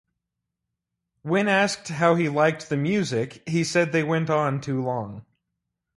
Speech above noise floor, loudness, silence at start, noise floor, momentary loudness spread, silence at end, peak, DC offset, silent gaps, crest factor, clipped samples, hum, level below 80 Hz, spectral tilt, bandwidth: 60 dB; -23 LUFS; 1.25 s; -83 dBFS; 8 LU; 0.75 s; -6 dBFS; under 0.1%; none; 20 dB; under 0.1%; none; -64 dBFS; -5.5 dB/octave; 11.5 kHz